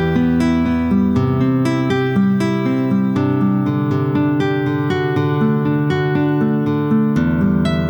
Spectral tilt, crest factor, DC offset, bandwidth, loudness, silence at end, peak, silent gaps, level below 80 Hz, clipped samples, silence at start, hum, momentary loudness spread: -8.5 dB/octave; 12 dB; under 0.1%; 19.5 kHz; -17 LUFS; 0 s; -4 dBFS; none; -38 dBFS; under 0.1%; 0 s; none; 2 LU